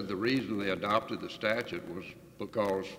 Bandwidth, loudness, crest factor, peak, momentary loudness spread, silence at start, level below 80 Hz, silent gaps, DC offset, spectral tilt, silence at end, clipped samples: 16 kHz; -33 LUFS; 20 dB; -14 dBFS; 13 LU; 0 s; -66 dBFS; none; under 0.1%; -5.5 dB/octave; 0 s; under 0.1%